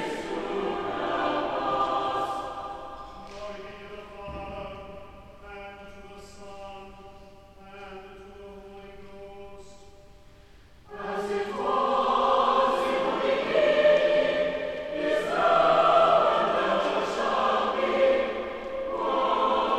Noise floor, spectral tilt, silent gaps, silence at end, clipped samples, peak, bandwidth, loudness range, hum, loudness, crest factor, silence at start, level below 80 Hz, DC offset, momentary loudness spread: -53 dBFS; -4.5 dB/octave; none; 0 s; under 0.1%; -8 dBFS; 12.5 kHz; 22 LU; none; -25 LUFS; 18 dB; 0 s; -54 dBFS; 0.2%; 24 LU